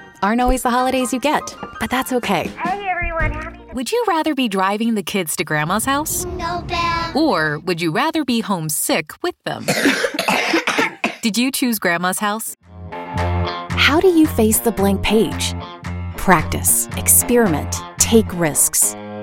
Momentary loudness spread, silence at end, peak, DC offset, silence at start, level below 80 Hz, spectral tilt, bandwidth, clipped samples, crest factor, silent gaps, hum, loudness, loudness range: 10 LU; 0 s; 0 dBFS; under 0.1%; 0 s; -36 dBFS; -3.5 dB/octave; 17 kHz; under 0.1%; 18 dB; none; none; -17 LUFS; 4 LU